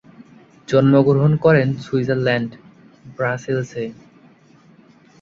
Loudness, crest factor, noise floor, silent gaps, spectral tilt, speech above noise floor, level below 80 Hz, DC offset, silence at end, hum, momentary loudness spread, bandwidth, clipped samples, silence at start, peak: -18 LUFS; 18 dB; -50 dBFS; none; -8 dB/octave; 33 dB; -56 dBFS; under 0.1%; 1.3 s; none; 14 LU; 7.4 kHz; under 0.1%; 0.7 s; -2 dBFS